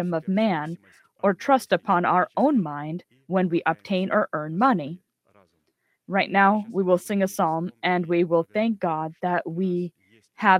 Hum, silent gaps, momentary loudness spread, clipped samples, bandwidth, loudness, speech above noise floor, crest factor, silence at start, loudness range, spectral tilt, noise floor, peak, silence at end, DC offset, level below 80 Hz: none; none; 9 LU; under 0.1%; 16 kHz; -24 LUFS; 49 dB; 22 dB; 0 s; 2 LU; -6.5 dB/octave; -72 dBFS; -2 dBFS; 0 s; under 0.1%; -72 dBFS